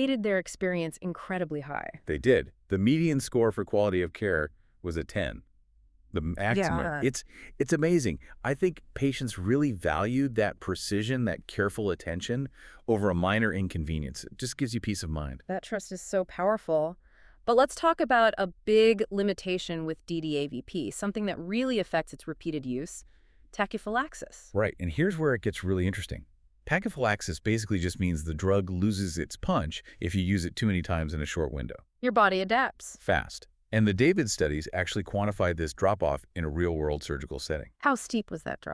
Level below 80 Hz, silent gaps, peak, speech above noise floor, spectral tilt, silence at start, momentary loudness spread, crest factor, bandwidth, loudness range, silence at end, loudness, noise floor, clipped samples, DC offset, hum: -46 dBFS; none; -10 dBFS; 33 dB; -5.5 dB/octave; 0 s; 11 LU; 20 dB; 11 kHz; 5 LU; 0 s; -29 LUFS; -62 dBFS; under 0.1%; under 0.1%; none